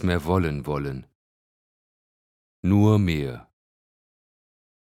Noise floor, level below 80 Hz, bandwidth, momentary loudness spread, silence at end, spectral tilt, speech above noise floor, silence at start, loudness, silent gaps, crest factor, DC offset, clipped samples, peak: under -90 dBFS; -46 dBFS; 14 kHz; 15 LU; 1.4 s; -8 dB/octave; over 68 dB; 0 s; -23 LUFS; 1.15-2.63 s; 20 dB; under 0.1%; under 0.1%; -6 dBFS